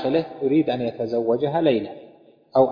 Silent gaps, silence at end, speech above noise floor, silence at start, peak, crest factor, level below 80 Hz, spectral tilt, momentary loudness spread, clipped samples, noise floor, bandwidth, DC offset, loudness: none; 0 s; 29 dB; 0 s; -4 dBFS; 18 dB; -62 dBFS; -9 dB/octave; 5 LU; under 0.1%; -51 dBFS; 5.2 kHz; under 0.1%; -22 LUFS